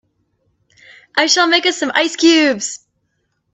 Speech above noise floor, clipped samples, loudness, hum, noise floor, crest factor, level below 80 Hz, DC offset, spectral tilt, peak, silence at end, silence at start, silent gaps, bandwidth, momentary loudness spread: 54 dB; under 0.1%; -14 LUFS; none; -68 dBFS; 16 dB; -66 dBFS; under 0.1%; -1 dB/octave; 0 dBFS; 0.75 s; 1.15 s; none; 8.4 kHz; 11 LU